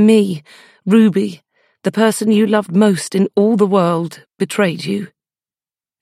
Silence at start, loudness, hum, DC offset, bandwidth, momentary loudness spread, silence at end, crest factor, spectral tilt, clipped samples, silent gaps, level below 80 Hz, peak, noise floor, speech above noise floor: 0 s; -15 LUFS; none; under 0.1%; 14.5 kHz; 12 LU; 0.95 s; 14 dB; -6 dB/octave; under 0.1%; none; -68 dBFS; 0 dBFS; under -90 dBFS; over 76 dB